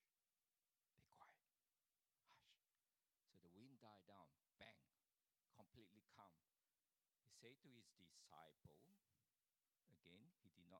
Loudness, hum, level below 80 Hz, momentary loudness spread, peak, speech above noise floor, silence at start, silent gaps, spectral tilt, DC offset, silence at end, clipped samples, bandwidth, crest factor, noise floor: -69 LUFS; none; under -90 dBFS; 1 LU; -48 dBFS; over 19 dB; 0 s; none; -4 dB/octave; under 0.1%; 0 s; under 0.1%; 10 kHz; 26 dB; under -90 dBFS